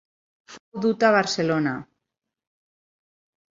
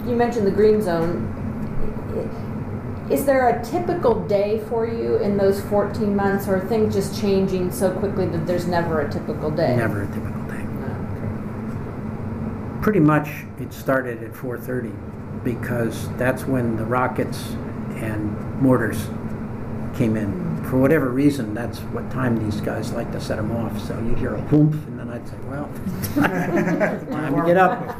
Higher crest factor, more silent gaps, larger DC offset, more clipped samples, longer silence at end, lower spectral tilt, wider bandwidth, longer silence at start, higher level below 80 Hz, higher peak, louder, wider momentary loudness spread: about the same, 22 dB vs 18 dB; first, 0.60-0.72 s vs none; neither; neither; first, 1.7 s vs 0 s; second, -5 dB/octave vs -7.5 dB/octave; second, 7.8 kHz vs 16 kHz; first, 0.5 s vs 0 s; second, -68 dBFS vs -38 dBFS; about the same, -4 dBFS vs -2 dBFS; about the same, -22 LUFS vs -22 LUFS; about the same, 14 LU vs 12 LU